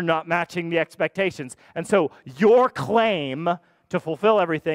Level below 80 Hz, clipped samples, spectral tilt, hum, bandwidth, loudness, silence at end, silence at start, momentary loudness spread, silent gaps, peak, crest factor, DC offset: -64 dBFS; under 0.1%; -6 dB/octave; none; 14 kHz; -22 LUFS; 0 s; 0 s; 12 LU; none; -6 dBFS; 16 dB; under 0.1%